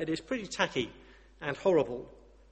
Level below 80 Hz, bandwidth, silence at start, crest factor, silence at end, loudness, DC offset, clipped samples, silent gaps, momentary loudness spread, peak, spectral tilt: -60 dBFS; 8.4 kHz; 0 s; 22 dB; 0.35 s; -32 LUFS; under 0.1%; under 0.1%; none; 13 LU; -12 dBFS; -4.5 dB/octave